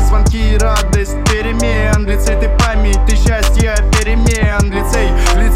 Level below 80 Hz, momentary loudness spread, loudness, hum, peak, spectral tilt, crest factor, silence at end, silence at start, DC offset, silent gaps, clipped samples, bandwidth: -12 dBFS; 2 LU; -13 LUFS; none; -2 dBFS; -5 dB/octave; 8 dB; 0 s; 0 s; under 0.1%; none; under 0.1%; 15 kHz